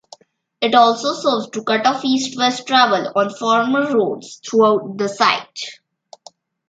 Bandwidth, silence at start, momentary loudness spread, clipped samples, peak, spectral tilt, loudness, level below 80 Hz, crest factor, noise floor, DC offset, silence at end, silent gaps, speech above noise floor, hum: 9.2 kHz; 0.6 s; 9 LU; under 0.1%; 0 dBFS; -3.5 dB/octave; -17 LUFS; -70 dBFS; 18 dB; -47 dBFS; under 0.1%; 0.95 s; none; 30 dB; none